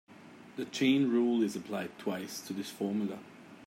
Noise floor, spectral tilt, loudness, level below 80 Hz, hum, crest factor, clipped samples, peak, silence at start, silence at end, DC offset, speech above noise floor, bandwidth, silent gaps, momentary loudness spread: -53 dBFS; -5 dB/octave; -33 LUFS; -82 dBFS; none; 16 dB; under 0.1%; -18 dBFS; 0.1 s; 0 s; under 0.1%; 21 dB; 16 kHz; none; 19 LU